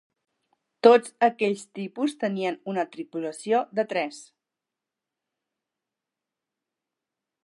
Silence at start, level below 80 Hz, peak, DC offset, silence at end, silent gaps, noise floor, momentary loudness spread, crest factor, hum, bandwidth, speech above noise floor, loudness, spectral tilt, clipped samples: 0.85 s; -86 dBFS; -4 dBFS; under 0.1%; 3.2 s; none; -88 dBFS; 15 LU; 24 dB; none; 11.5 kHz; 63 dB; -25 LUFS; -5 dB/octave; under 0.1%